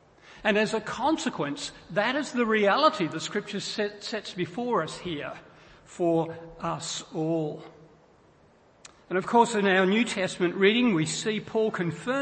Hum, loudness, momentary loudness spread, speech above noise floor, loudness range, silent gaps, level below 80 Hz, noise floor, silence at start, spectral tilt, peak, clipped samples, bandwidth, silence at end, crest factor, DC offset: none; -27 LUFS; 12 LU; 32 dB; 7 LU; none; -64 dBFS; -59 dBFS; 0.3 s; -4.5 dB/octave; -8 dBFS; under 0.1%; 8.8 kHz; 0 s; 20 dB; under 0.1%